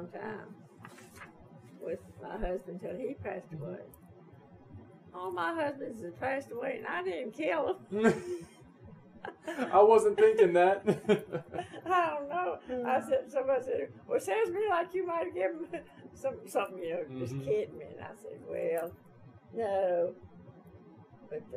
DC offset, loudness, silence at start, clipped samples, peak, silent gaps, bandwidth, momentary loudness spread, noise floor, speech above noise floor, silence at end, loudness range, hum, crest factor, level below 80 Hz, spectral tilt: under 0.1%; -32 LUFS; 0 s; under 0.1%; -12 dBFS; none; 15 kHz; 21 LU; -55 dBFS; 24 dB; 0 s; 14 LU; none; 22 dB; -60 dBFS; -6 dB/octave